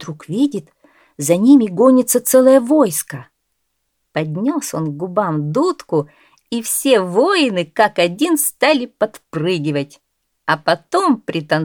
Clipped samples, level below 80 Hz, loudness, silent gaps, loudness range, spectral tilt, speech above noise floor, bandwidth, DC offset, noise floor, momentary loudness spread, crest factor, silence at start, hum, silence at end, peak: under 0.1%; -66 dBFS; -16 LUFS; none; 7 LU; -4.5 dB/octave; 56 dB; 19 kHz; under 0.1%; -71 dBFS; 13 LU; 16 dB; 0 s; none; 0 s; 0 dBFS